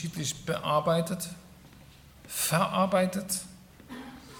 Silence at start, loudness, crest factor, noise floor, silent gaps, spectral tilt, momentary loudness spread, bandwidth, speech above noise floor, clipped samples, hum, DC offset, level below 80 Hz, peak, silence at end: 0 s; -29 LUFS; 20 dB; -53 dBFS; none; -4 dB/octave; 19 LU; 19 kHz; 24 dB; under 0.1%; none; under 0.1%; -60 dBFS; -12 dBFS; 0 s